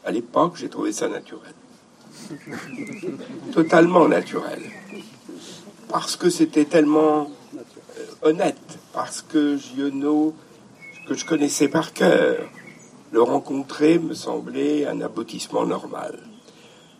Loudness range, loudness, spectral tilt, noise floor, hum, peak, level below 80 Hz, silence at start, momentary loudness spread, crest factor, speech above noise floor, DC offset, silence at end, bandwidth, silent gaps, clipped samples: 4 LU; -21 LUFS; -5 dB/octave; -49 dBFS; none; -2 dBFS; -74 dBFS; 0.05 s; 22 LU; 20 dB; 28 dB; under 0.1%; 0.65 s; 15 kHz; none; under 0.1%